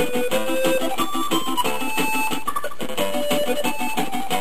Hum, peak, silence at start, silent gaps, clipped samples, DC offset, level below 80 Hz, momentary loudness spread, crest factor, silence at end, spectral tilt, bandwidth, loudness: 60 Hz at -45 dBFS; -6 dBFS; 0 s; none; under 0.1%; 7%; -54 dBFS; 4 LU; 16 dB; 0 s; -3 dB/octave; 15.5 kHz; -23 LUFS